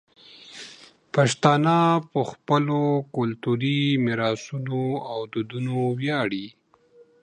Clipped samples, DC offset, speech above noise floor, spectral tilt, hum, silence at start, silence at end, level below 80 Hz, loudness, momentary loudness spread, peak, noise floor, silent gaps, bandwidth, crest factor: under 0.1%; under 0.1%; 33 dB; -6 dB/octave; none; 0.35 s; 0.75 s; -68 dBFS; -24 LUFS; 14 LU; -2 dBFS; -56 dBFS; none; 10 kHz; 22 dB